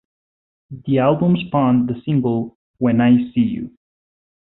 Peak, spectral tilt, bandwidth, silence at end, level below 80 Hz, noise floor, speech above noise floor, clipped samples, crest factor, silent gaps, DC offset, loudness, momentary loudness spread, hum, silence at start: -4 dBFS; -13 dB/octave; 4 kHz; 0.8 s; -52 dBFS; under -90 dBFS; over 73 dB; under 0.1%; 16 dB; 2.55-2.74 s; under 0.1%; -18 LUFS; 14 LU; none; 0.7 s